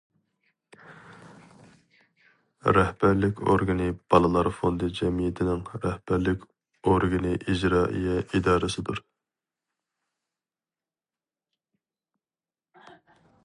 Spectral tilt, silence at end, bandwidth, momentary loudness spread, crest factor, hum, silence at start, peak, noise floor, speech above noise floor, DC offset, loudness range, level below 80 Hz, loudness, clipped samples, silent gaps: -7 dB/octave; 4.45 s; 11 kHz; 8 LU; 22 dB; none; 0.9 s; -4 dBFS; under -90 dBFS; over 66 dB; under 0.1%; 7 LU; -44 dBFS; -25 LUFS; under 0.1%; none